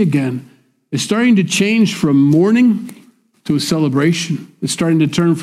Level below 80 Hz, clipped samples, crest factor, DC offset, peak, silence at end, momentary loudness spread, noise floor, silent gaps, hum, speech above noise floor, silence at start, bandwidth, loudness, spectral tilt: -56 dBFS; under 0.1%; 10 dB; under 0.1%; -4 dBFS; 0 s; 11 LU; -43 dBFS; none; none; 30 dB; 0 s; 15 kHz; -15 LUFS; -5.5 dB/octave